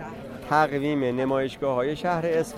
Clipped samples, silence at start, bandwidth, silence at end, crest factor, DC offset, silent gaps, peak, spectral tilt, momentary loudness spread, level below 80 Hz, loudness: under 0.1%; 0 s; 15.5 kHz; 0 s; 18 dB; under 0.1%; none; -6 dBFS; -6.5 dB/octave; 4 LU; -54 dBFS; -25 LUFS